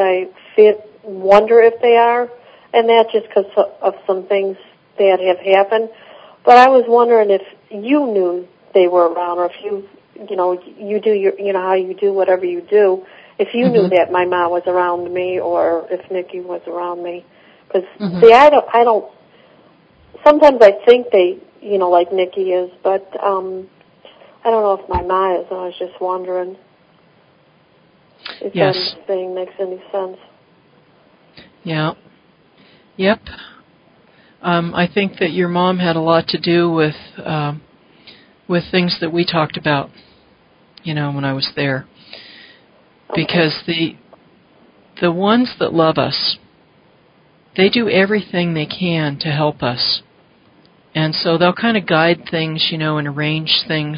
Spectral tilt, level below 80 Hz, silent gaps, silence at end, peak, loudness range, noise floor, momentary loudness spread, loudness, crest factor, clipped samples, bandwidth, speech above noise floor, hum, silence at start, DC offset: -7.5 dB/octave; -50 dBFS; none; 0 s; 0 dBFS; 10 LU; -52 dBFS; 14 LU; -15 LUFS; 16 dB; 0.2%; 8 kHz; 38 dB; none; 0 s; under 0.1%